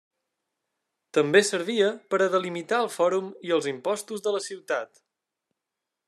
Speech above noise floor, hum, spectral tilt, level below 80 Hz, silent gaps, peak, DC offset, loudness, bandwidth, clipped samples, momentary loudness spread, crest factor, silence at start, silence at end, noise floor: 60 dB; none; -3.5 dB/octave; -86 dBFS; none; -6 dBFS; under 0.1%; -26 LUFS; 13.5 kHz; under 0.1%; 10 LU; 22 dB; 1.15 s; 1.2 s; -86 dBFS